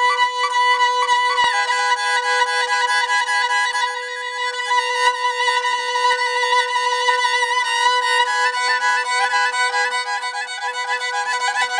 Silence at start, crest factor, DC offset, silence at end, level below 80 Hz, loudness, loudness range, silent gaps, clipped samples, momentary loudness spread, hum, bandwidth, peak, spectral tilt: 0 s; 14 dB; under 0.1%; 0 s; -70 dBFS; -18 LUFS; 2 LU; none; under 0.1%; 6 LU; none; 10 kHz; -4 dBFS; 3.5 dB/octave